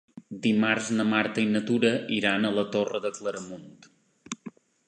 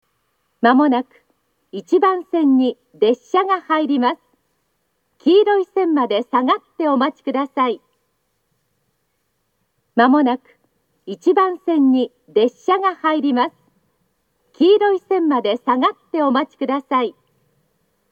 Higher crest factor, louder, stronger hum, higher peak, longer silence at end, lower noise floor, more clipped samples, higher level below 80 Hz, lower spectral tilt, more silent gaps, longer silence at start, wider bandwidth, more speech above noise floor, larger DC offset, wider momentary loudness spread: about the same, 18 dB vs 18 dB; second, -26 LUFS vs -17 LUFS; neither; second, -8 dBFS vs 0 dBFS; second, 0.4 s vs 1 s; second, -47 dBFS vs -70 dBFS; neither; first, -70 dBFS vs -80 dBFS; about the same, -4.5 dB/octave vs -5.5 dB/octave; neither; second, 0.15 s vs 0.6 s; first, 9.4 kHz vs 7.2 kHz; second, 21 dB vs 53 dB; neither; first, 16 LU vs 8 LU